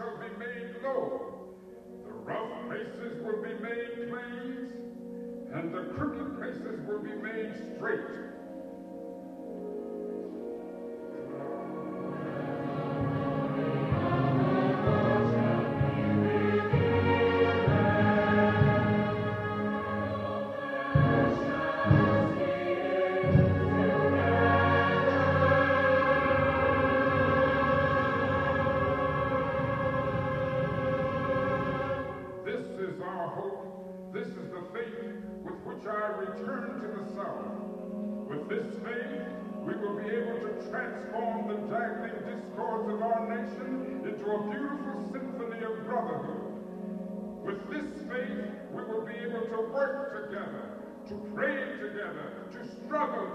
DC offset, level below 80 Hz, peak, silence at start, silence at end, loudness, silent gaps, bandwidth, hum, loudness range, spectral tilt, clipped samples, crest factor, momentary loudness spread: under 0.1%; -54 dBFS; -10 dBFS; 0 s; 0 s; -30 LUFS; none; 8.8 kHz; none; 12 LU; -8.5 dB/octave; under 0.1%; 20 dB; 15 LU